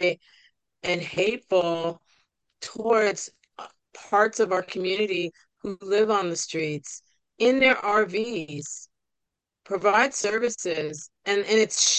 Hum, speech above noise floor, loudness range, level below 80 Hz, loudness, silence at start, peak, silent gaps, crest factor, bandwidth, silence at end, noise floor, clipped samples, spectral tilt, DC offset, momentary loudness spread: none; 59 dB; 3 LU; -70 dBFS; -24 LUFS; 0 s; -6 dBFS; none; 20 dB; 9.2 kHz; 0 s; -84 dBFS; under 0.1%; -2.5 dB/octave; under 0.1%; 17 LU